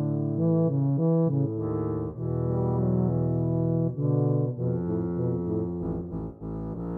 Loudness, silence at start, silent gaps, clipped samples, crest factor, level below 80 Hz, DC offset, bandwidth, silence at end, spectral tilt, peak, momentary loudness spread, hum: -27 LUFS; 0 s; none; under 0.1%; 12 dB; -48 dBFS; under 0.1%; 2 kHz; 0 s; -14 dB/octave; -14 dBFS; 9 LU; none